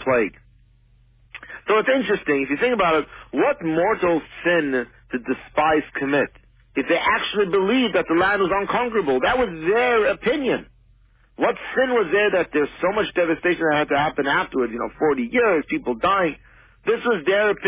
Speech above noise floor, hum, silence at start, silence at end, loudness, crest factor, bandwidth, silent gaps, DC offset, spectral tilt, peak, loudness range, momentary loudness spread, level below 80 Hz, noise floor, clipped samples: 35 dB; none; 0 s; 0 s; -21 LUFS; 14 dB; 4 kHz; none; under 0.1%; -9 dB/octave; -6 dBFS; 2 LU; 8 LU; -50 dBFS; -55 dBFS; under 0.1%